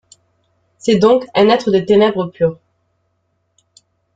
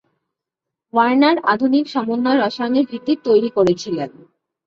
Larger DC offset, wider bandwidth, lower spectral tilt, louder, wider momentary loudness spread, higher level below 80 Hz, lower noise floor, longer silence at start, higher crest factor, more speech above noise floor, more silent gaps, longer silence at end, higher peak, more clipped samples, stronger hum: neither; first, 9 kHz vs 7.6 kHz; about the same, -6 dB/octave vs -6 dB/octave; first, -14 LUFS vs -17 LUFS; about the same, 7 LU vs 8 LU; first, -54 dBFS vs -60 dBFS; second, -66 dBFS vs -83 dBFS; about the same, 0.85 s vs 0.95 s; about the same, 16 dB vs 16 dB; second, 53 dB vs 67 dB; neither; first, 1.6 s vs 0.6 s; about the same, -2 dBFS vs -2 dBFS; neither; neither